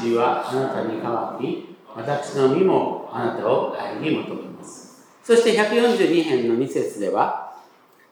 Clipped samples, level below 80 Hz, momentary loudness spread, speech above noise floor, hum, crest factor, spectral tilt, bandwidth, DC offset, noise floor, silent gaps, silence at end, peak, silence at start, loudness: under 0.1%; -80 dBFS; 16 LU; 32 dB; none; 18 dB; -5.5 dB/octave; 17 kHz; under 0.1%; -53 dBFS; none; 0.5 s; -4 dBFS; 0 s; -21 LUFS